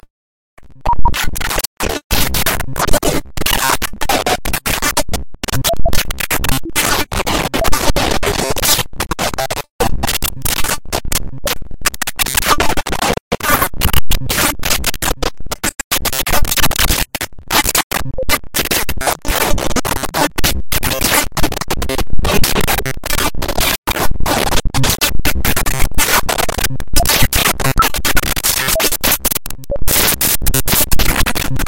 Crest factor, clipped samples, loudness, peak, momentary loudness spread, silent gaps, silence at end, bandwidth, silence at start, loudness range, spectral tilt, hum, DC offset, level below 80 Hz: 12 dB; under 0.1%; -15 LUFS; 0 dBFS; 7 LU; 0.10-0.57 s, 1.67-1.77 s, 2.04-2.10 s, 9.70-9.79 s, 13.20-13.31 s, 15.84-15.91 s, 17.83-17.90 s, 23.78-23.83 s; 0 s; 17.5 kHz; 0 s; 3 LU; -2.5 dB/octave; none; under 0.1%; -22 dBFS